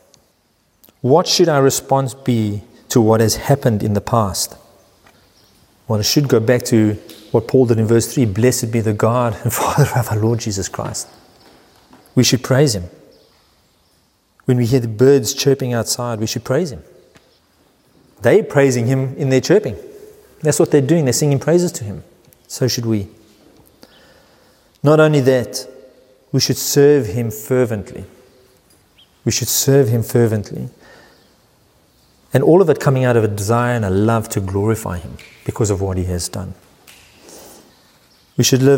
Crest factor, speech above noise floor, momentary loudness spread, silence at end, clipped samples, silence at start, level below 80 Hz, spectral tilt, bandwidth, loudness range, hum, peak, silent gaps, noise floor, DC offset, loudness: 16 dB; 45 dB; 14 LU; 0 s; under 0.1%; 1.05 s; -48 dBFS; -5.5 dB/octave; 16.5 kHz; 5 LU; none; 0 dBFS; none; -60 dBFS; under 0.1%; -16 LUFS